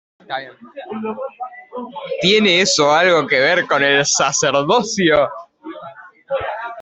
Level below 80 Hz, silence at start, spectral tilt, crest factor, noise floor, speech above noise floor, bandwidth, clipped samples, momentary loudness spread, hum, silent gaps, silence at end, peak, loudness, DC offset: -56 dBFS; 0.3 s; -2.5 dB/octave; 16 dB; -38 dBFS; 22 dB; 8.4 kHz; under 0.1%; 21 LU; none; none; 0 s; -2 dBFS; -15 LUFS; under 0.1%